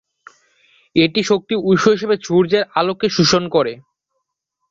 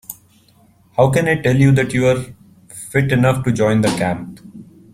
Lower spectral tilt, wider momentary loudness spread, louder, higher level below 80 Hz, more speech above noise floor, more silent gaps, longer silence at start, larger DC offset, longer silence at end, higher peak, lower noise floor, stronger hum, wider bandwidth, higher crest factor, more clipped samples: second, -5 dB/octave vs -6.5 dB/octave; second, 5 LU vs 21 LU; about the same, -16 LUFS vs -16 LUFS; second, -54 dBFS vs -46 dBFS; first, 59 dB vs 37 dB; neither; first, 0.95 s vs 0.1 s; neither; first, 0.9 s vs 0.3 s; about the same, -2 dBFS vs -2 dBFS; first, -75 dBFS vs -52 dBFS; neither; second, 7.6 kHz vs 16 kHz; about the same, 16 dB vs 16 dB; neither